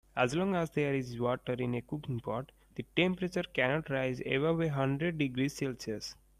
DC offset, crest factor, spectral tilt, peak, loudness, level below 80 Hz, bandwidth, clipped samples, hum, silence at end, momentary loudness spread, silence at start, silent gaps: under 0.1%; 20 dB; -6 dB/octave; -12 dBFS; -33 LUFS; -60 dBFS; 15 kHz; under 0.1%; none; 0.25 s; 8 LU; 0.15 s; none